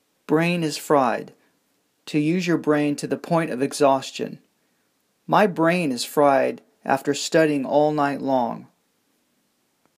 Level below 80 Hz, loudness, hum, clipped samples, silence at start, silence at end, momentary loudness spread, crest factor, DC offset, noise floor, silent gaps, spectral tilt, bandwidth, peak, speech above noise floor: -76 dBFS; -22 LUFS; none; under 0.1%; 0.3 s; 1.35 s; 9 LU; 18 dB; under 0.1%; -68 dBFS; none; -5.5 dB/octave; 15.5 kHz; -4 dBFS; 47 dB